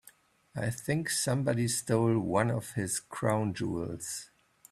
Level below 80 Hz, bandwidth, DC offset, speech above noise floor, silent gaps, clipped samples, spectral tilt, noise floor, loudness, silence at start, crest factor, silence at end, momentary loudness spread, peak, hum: -62 dBFS; 14.5 kHz; under 0.1%; 30 dB; none; under 0.1%; -5 dB/octave; -61 dBFS; -31 LUFS; 0.55 s; 20 dB; 0.45 s; 9 LU; -12 dBFS; none